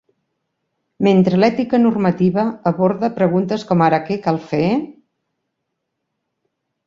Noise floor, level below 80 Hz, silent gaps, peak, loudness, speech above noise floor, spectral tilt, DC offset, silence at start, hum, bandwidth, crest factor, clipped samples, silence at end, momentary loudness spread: -76 dBFS; -56 dBFS; none; -2 dBFS; -17 LUFS; 60 dB; -8.5 dB/octave; under 0.1%; 1 s; none; 7.2 kHz; 16 dB; under 0.1%; 1.95 s; 6 LU